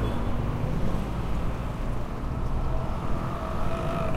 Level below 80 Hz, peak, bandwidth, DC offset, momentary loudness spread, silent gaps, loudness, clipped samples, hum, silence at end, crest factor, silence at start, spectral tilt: -30 dBFS; -14 dBFS; 12.5 kHz; under 0.1%; 3 LU; none; -31 LUFS; under 0.1%; none; 0 s; 12 dB; 0 s; -7.5 dB/octave